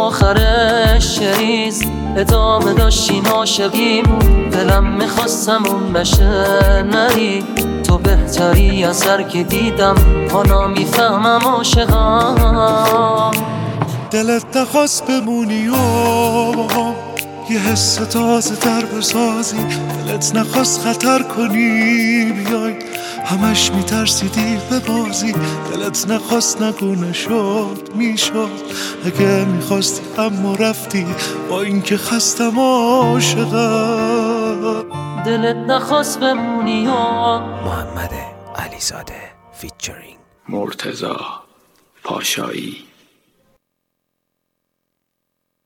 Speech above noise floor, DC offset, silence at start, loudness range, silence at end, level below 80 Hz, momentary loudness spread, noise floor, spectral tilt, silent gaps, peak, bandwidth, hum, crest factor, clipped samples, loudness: 59 dB; under 0.1%; 0 s; 11 LU; 2.85 s; -22 dBFS; 11 LU; -74 dBFS; -4.5 dB/octave; none; 0 dBFS; 19 kHz; none; 14 dB; under 0.1%; -15 LUFS